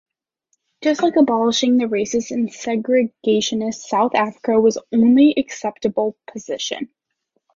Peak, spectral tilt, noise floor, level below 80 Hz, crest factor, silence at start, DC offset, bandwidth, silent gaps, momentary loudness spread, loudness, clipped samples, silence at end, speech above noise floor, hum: -4 dBFS; -4 dB/octave; -72 dBFS; -60 dBFS; 16 dB; 0.8 s; under 0.1%; 7.6 kHz; none; 10 LU; -18 LUFS; under 0.1%; 0.7 s; 54 dB; none